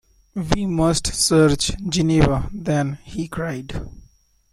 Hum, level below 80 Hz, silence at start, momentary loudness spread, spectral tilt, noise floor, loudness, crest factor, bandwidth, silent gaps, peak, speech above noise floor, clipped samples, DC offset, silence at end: none; -34 dBFS; 0.35 s; 15 LU; -5 dB/octave; -54 dBFS; -20 LUFS; 20 dB; 14.5 kHz; none; -2 dBFS; 34 dB; under 0.1%; under 0.1%; 0.55 s